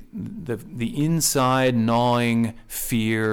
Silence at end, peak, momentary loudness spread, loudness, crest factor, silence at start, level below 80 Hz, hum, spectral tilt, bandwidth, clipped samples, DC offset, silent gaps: 0 s; -10 dBFS; 12 LU; -22 LUFS; 12 dB; 0 s; -46 dBFS; none; -5 dB/octave; 19.5 kHz; under 0.1%; under 0.1%; none